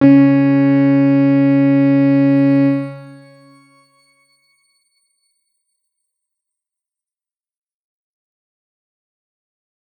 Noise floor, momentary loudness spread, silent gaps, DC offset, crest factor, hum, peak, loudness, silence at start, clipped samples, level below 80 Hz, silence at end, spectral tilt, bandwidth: under -90 dBFS; 4 LU; none; under 0.1%; 16 dB; none; -2 dBFS; -12 LUFS; 0 s; under 0.1%; -68 dBFS; 6.95 s; -10.5 dB/octave; 5 kHz